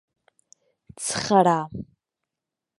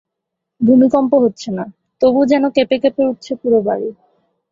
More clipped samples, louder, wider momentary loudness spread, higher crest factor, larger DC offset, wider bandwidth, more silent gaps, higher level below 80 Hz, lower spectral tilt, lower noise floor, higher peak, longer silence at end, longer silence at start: neither; second, -22 LUFS vs -15 LUFS; first, 20 LU vs 13 LU; first, 22 dB vs 14 dB; neither; first, 11.5 kHz vs 7.4 kHz; neither; about the same, -58 dBFS vs -56 dBFS; second, -4.5 dB/octave vs -6.5 dB/octave; first, -87 dBFS vs -78 dBFS; about the same, -4 dBFS vs -2 dBFS; first, 0.95 s vs 0.6 s; first, 1 s vs 0.6 s